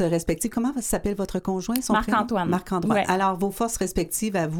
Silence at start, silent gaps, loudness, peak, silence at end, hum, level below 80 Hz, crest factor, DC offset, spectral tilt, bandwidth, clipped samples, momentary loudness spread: 0 s; none; -24 LUFS; -2 dBFS; 0 s; none; -42 dBFS; 22 dB; under 0.1%; -5 dB/octave; 19 kHz; under 0.1%; 4 LU